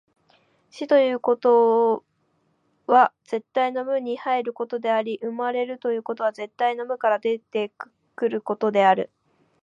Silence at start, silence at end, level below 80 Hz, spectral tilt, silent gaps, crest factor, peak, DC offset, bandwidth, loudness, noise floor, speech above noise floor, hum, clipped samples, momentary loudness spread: 0.75 s; 0.6 s; -82 dBFS; -6 dB/octave; none; 20 dB; -4 dBFS; under 0.1%; 7.4 kHz; -23 LUFS; -68 dBFS; 46 dB; none; under 0.1%; 11 LU